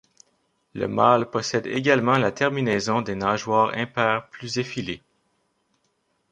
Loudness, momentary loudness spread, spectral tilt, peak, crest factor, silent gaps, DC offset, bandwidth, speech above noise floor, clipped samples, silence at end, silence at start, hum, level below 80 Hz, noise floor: -23 LUFS; 11 LU; -5 dB/octave; -2 dBFS; 22 dB; none; under 0.1%; 10.5 kHz; 48 dB; under 0.1%; 1.35 s; 0.75 s; none; -60 dBFS; -71 dBFS